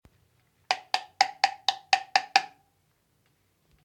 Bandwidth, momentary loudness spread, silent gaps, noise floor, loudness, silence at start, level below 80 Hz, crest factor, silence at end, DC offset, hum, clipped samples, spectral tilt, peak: 17 kHz; 7 LU; none; -70 dBFS; -27 LUFS; 0.7 s; -74 dBFS; 28 dB; 1.35 s; under 0.1%; none; under 0.1%; 1 dB/octave; -4 dBFS